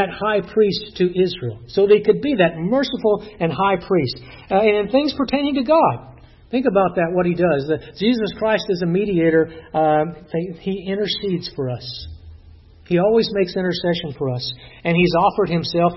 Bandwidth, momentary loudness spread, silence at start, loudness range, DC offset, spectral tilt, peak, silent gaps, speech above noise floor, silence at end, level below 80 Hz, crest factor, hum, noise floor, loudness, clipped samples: 6 kHz; 10 LU; 0 s; 4 LU; under 0.1%; -8 dB/octave; -4 dBFS; none; 26 dB; 0 s; -48 dBFS; 16 dB; none; -45 dBFS; -19 LUFS; under 0.1%